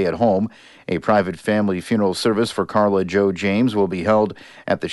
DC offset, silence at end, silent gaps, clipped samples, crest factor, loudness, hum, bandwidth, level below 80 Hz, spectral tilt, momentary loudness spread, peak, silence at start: under 0.1%; 0 s; none; under 0.1%; 14 dB; -19 LUFS; none; 11.5 kHz; -54 dBFS; -6 dB/octave; 7 LU; -4 dBFS; 0 s